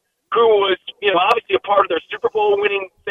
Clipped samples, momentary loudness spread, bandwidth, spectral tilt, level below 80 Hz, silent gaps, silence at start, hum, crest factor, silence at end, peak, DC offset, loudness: under 0.1%; 7 LU; 7.6 kHz; -4.5 dB/octave; -60 dBFS; none; 0.3 s; none; 18 dB; 0 s; 0 dBFS; under 0.1%; -17 LUFS